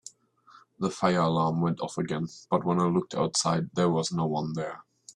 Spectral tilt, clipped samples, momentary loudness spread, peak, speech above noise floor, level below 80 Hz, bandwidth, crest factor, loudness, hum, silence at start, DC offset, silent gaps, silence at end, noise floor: -5.5 dB/octave; under 0.1%; 9 LU; -10 dBFS; 31 dB; -64 dBFS; 10.5 kHz; 18 dB; -28 LUFS; none; 0.8 s; under 0.1%; none; 0.05 s; -58 dBFS